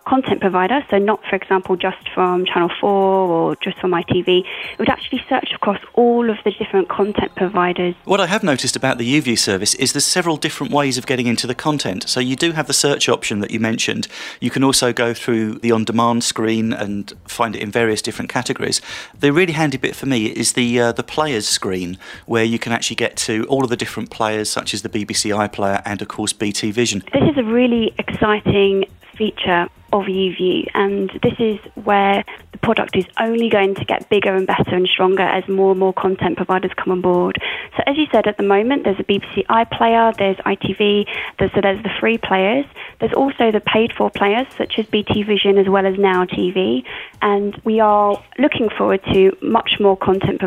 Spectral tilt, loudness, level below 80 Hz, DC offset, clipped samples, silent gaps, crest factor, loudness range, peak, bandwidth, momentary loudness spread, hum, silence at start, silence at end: -4 dB/octave; -17 LUFS; -48 dBFS; under 0.1%; under 0.1%; none; 16 dB; 3 LU; -2 dBFS; 16 kHz; 7 LU; none; 0.05 s; 0 s